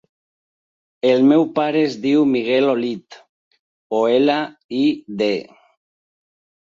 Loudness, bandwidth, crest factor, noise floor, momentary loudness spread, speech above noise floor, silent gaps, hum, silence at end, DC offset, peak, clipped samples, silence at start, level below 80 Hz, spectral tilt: -18 LUFS; 7.4 kHz; 16 dB; under -90 dBFS; 10 LU; over 73 dB; 3.29-3.51 s, 3.59-3.90 s, 4.64-4.69 s; none; 1.25 s; under 0.1%; -4 dBFS; under 0.1%; 1.05 s; -66 dBFS; -6.5 dB/octave